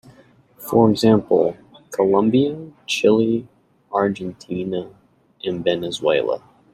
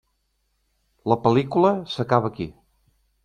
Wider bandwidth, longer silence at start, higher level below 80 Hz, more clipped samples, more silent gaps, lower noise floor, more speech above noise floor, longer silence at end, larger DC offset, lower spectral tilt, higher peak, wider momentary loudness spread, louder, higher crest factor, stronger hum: first, 16 kHz vs 9.8 kHz; second, 0.6 s vs 1.05 s; about the same, -56 dBFS vs -58 dBFS; neither; neither; second, -51 dBFS vs -71 dBFS; second, 33 dB vs 50 dB; second, 0.35 s vs 0.75 s; neither; second, -6 dB/octave vs -8 dB/octave; about the same, -2 dBFS vs -2 dBFS; about the same, 14 LU vs 14 LU; about the same, -20 LUFS vs -22 LUFS; about the same, 18 dB vs 22 dB; neither